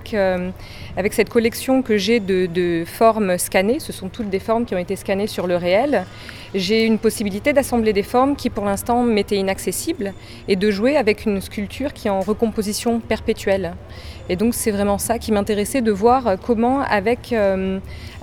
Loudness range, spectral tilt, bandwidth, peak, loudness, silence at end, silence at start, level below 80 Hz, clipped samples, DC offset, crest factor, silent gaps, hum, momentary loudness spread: 3 LU; -5 dB/octave; 19.5 kHz; -2 dBFS; -19 LUFS; 0 s; 0 s; -40 dBFS; under 0.1%; under 0.1%; 18 dB; none; none; 10 LU